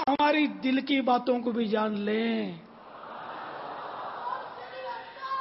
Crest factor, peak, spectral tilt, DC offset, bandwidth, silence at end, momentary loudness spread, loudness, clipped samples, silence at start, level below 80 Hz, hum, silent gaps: 16 dB; -14 dBFS; -8.5 dB/octave; under 0.1%; 5.8 kHz; 0 s; 16 LU; -29 LUFS; under 0.1%; 0 s; -72 dBFS; none; none